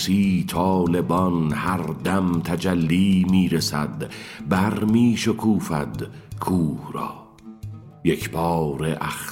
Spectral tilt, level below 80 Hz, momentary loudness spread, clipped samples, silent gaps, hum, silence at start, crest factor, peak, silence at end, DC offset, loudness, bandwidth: -6 dB/octave; -48 dBFS; 14 LU; under 0.1%; none; none; 0 s; 18 dB; -4 dBFS; 0 s; under 0.1%; -22 LUFS; 16.5 kHz